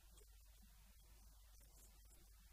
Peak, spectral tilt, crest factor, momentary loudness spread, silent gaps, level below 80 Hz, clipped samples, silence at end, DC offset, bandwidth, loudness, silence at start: -52 dBFS; -3 dB/octave; 14 dB; 2 LU; none; -66 dBFS; under 0.1%; 0 s; under 0.1%; 15.5 kHz; -68 LUFS; 0 s